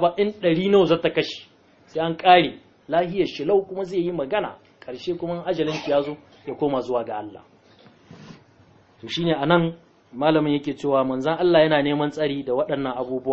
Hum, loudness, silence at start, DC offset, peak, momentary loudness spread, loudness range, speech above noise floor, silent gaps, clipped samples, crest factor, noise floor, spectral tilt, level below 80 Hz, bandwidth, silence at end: none; -22 LUFS; 0 s; under 0.1%; 0 dBFS; 15 LU; 7 LU; 33 dB; none; under 0.1%; 22 dB; -54 dBFS; -6.5 dB/octave; -56 dBFS; 7.8 kHz; 0 s